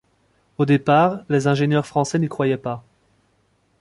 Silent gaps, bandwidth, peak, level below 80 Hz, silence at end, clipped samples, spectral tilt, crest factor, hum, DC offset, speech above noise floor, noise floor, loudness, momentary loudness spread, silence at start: none; 11.5 kHz; -2 dBFS; -58 dBFS; 1 s; under 0.1%; -7 dB/octave; 18 dB; none; under 0.1%; 45 dB; -64 dBFS; -20 LUFS; 12 LU; 0.6 s